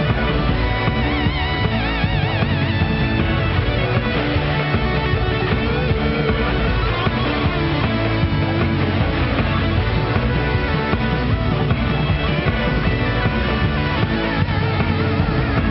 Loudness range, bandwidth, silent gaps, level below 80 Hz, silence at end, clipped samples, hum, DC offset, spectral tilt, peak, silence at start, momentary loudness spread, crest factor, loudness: 0 LU; 6 kHz; none; -26 dBFS; 0 s; under 0.1%; none; under 0.1%; -5 dB/octave; -4 dBFS; 0 s; 1 LU; 14 dB; -19 LUFS